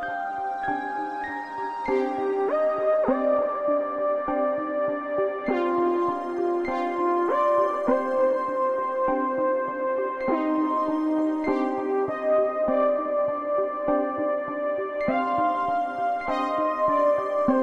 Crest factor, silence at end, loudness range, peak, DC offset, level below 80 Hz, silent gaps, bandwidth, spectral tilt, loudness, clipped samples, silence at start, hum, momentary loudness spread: 16 dB; 0 s; 2 LU; -10 dBFS; under 0.1%; -60 dBFS; none; 7.8 kHz; -7 dB/octave; -25 LUFS; under 0.1%; 0 s; none; 5 LU